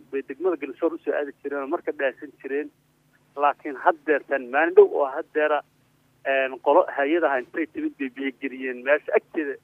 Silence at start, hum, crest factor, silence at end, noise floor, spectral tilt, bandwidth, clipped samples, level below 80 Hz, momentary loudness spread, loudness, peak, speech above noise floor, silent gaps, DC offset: 0.1 s; none; 22 dB; 0.05 s; -62 dBFS; -6 dB/octave; 3.7 kHz; under 0.1%; -78 dBFS; 11 LU; -24 LUFS; -2 dBFS; 39 dB; none; under 0.1%